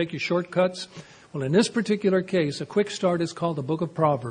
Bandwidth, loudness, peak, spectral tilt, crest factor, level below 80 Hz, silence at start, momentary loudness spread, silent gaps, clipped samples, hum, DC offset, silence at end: 10.5 kHz; -25 LUFS; -6 dBFS; -6 dB/octave; 18 dB; -64 dBFS; 0 s; 10 LU; none; under 0.1%; none; under 0.1%; 0 s